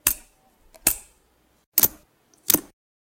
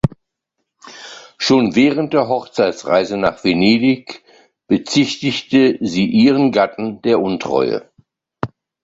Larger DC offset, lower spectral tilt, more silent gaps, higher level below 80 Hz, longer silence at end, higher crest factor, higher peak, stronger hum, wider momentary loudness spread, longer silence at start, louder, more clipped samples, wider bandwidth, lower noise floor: neither; second, -1 dB/octave vs -5.5 dB/octave; first, 1.66-1.72 s vs none; about the same, -52 dBFS vs -48 dBFS; about the same, 0.45 s vs 0.35 s; first, 26 dB vs 16 dB; about the same, -2 dBFS vs -2 dBFS; neither; second, 12 LU vs 15 LU; about the same, 0.05 s vs 0.05 s; second, -22 LUFS vs -16 LUFS; neither; first, 17 kHz vs 7.8 kHz; second, -63 dBFS vs -75 dBFS